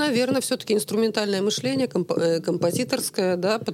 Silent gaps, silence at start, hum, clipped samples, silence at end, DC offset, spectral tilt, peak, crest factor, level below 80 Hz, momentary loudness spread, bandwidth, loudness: none; 0 s; none; under 0.1%; 0 s; under 0.1%; -4.5 dB/octave; -8 dBFS; 16 dB; -72 dBFS; 2 LU; 16.5 kHz; -23 LUFS